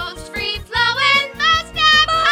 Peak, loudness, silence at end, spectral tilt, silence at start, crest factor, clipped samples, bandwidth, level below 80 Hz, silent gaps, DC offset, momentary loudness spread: 0 dBFS; -14 LUFS; 0 s; -1.5 dB/octave; 0 s; 16 dB; under 0.1%; 16.5 kHz; -38 dBFS; none; under 0.1%; 11 LU